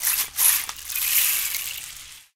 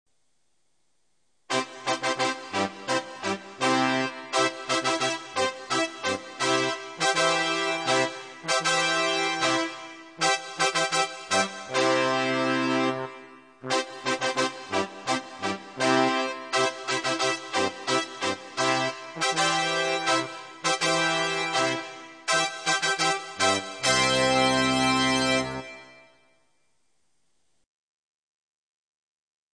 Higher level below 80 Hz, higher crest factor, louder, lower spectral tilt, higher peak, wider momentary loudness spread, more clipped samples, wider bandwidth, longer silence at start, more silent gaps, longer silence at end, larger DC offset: first, -56 dBFS vs -64 dBFS; about the same, 24 dB vs 20 dB; first, -20 LUFS vs -25 LUFS; second, 3.5 dB/octave vs -2.5 dB/octave; first, -2 dBFS vs -8 dBFS; first, 16 LU vs 8 LU; neither; first, 19 kHz vs 10 kHz; second, 0 s vs 1.5 s; neither; second, 0.15 s vs 3.6 s; neither